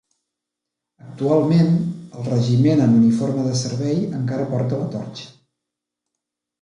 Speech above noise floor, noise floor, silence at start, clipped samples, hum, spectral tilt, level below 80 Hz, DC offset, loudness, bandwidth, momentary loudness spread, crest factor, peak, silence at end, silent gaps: 65 dB; -83 dBFS; 1.05 s; under 0.1%; none; -7.5 dB/octave; -60 dBFS; under 0.1%; -19 LUFS; 11 kHz; 13 LU; 16 dB; -6 dBFS; 1.3 s; none